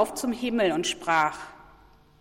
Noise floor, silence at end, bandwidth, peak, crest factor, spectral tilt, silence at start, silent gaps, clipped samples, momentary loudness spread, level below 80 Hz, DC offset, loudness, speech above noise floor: -55 dBFS; 0.6 s; 16.5 kHz; -10 dBFS; 18 dB; -3 dB/octave; 0 s; none; under 0.1%; 12 LU; -58 dBFS; under 0.1%; -26 LUFS; 29 dB